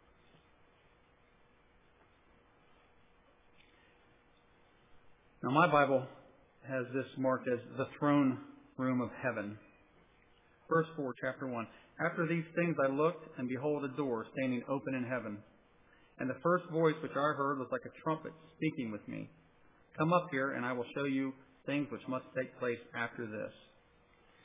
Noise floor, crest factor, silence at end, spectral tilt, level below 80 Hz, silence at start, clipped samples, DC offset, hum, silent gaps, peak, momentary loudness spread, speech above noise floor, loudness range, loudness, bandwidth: -67 dBFS; 24 dB; 0.9 s; -5.5 dB/octave; -76 dBFS; 4.95 s; under 0.1%; under 0.1%; none; none; -14 dBFS; 13 LU; 32 dB; 4 LU; -36 LUFS; 3.8 kHz